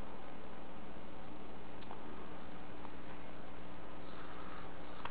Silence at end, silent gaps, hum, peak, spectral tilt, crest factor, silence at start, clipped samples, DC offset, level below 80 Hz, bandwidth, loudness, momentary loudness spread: 0 s; none; none; -26 dBFS; -4.5 dB/octave; 22 dB; 0 s; under 0.1%; 2%; -62 dBFS; 4 kHz; -51 LUFS; 2 LU